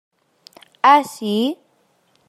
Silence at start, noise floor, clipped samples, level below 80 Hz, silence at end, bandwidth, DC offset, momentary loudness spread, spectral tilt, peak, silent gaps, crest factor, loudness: 0.85 s; -62 dBFS; under 0.1%; -76 dBFS; 0.75 s; 15 kHz; under 0.1%; 10 LU; -4.5 dB/octave; -2 dBFS; none; 20 dB; -17 LUFS